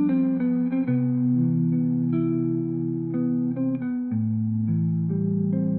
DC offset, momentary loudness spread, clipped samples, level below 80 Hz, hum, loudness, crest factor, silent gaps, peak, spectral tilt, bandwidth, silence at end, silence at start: under 0.1%; 4 LU; under 0.1%; -66 dBFS; none; -24 LUFS; 10 dB; none; -14 dBFS; -12.5 dB/octave; 2.6 kHz; 0 s; 0 s